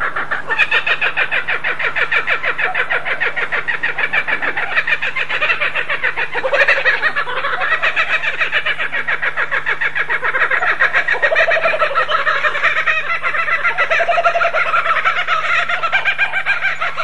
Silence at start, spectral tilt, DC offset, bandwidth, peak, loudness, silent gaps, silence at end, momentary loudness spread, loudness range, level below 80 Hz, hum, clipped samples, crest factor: 0 s; -2.5 dB/octave; 7%; 11.5 kHz; 0 dBFS; -15 LUFS; none; 0 s; 4 LU; 2 LU; -52 dBFS; none; under 0.1%; 16 dB